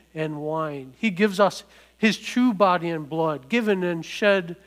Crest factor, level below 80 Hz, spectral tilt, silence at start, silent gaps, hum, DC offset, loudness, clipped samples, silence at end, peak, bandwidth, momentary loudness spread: 18 dB; -64 dBFS; -5.5 dB/octave; 0.15 s; none; none; under 0.1%; -23 LUFS; under 0.1%; 0.1 s; -4 dBFS; 16 kHz; 8 LU